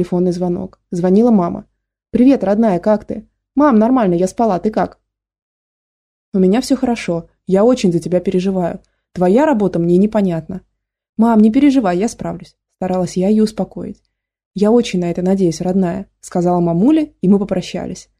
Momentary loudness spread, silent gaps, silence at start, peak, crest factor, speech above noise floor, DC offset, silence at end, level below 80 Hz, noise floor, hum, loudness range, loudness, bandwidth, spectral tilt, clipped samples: 14 LU; 5.42-6.32 s, 11.09-11.13 s, 14.46-14.51 s; 0 s; -2 dBFS; 14 dB; over 76 dB; under 0.1%; 0.2 s; -46 dBFS; under -90 dBFS; none; 3 LU; -15 LUFS; 11.5 kHz; -7.5 dB/octave; under 0.1%